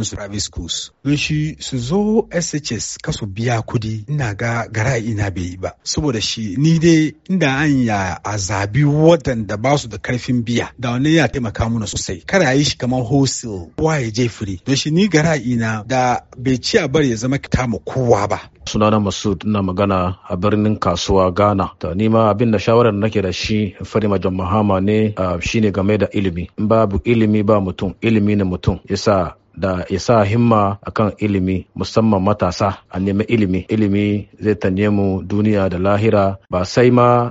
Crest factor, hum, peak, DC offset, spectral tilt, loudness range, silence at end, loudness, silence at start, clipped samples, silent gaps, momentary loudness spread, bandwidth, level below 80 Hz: 16 dB; none; 0 dBFS; under 0.1%; -5.5 dB/octave; 4 LU; 0 s; -17 LUFS; 0 s; under 0.1%; none; 8 LU; 8 kHz; -38 dBFS